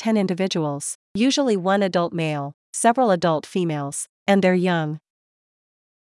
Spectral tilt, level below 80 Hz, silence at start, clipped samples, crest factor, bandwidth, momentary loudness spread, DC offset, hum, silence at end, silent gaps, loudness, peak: -5 dB/octave; -66 dBFS; 0 s; under 0.1%; 18 dB; 12 kHz; 11 LU; under 0.1%; none; 1.1 s; 0.95-1.15 s, 2.54-2.73 s, 4.09-4.26 s; -21 LUFS; -4 dBFS